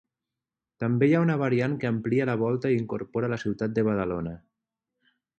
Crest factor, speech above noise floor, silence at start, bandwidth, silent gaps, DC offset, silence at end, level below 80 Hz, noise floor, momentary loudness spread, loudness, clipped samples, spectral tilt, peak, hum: 18 dB; 63 dB; 0.8 s; 8.4 kHz; none; under 0.1%; 1 s; -58 dBFS; -89 dBFS; 9 LU; -26 LUFS; under 0.1%; -9 dB/octave; -10 dBFS; none